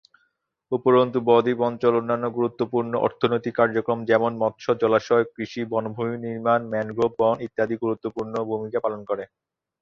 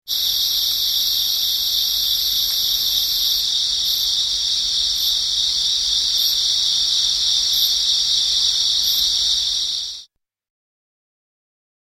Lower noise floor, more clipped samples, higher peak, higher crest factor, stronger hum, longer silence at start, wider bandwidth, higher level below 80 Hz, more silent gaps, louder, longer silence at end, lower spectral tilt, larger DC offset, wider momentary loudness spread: first, -71 dBFS vs -49 dBFS; neither; about the same, -4 dBFS vs -4 dBFS; about the same, 20 dB vs 16 dB; neither; first, 0.7 s vs 0.05 s; second, 6.8 kHz vs 16.5 kHz; second, -64 dBFS vs -48 dBFS; neither; second, -23 LUFS vs -16 LUFS; second, 0.55 s vs 1.9 s; first, -7.5 dB/octave vs 2.5 dB/octave; neither; first, 9 LU vs 2 LU